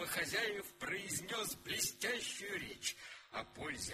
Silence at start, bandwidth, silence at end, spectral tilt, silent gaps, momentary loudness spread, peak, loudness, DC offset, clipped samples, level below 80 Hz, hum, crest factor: 0 s; 15.5 kHz; 0 s; -1.5 dB/octave; none; 9 LU; -22 dBFS; -40 LUFS; under 0.1%; under 0.1%; -68 dBFS; none; 20 dB